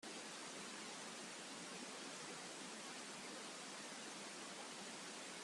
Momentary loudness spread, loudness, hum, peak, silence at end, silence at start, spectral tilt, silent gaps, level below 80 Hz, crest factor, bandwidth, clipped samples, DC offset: 1 LU; -50 LUFS; none; -38 dBFS; 0 s; 0 s; -1.5 dB/octave; none; under -90 dBFS; 14 dB; 13 kHz; under 0.1%; under 0.1%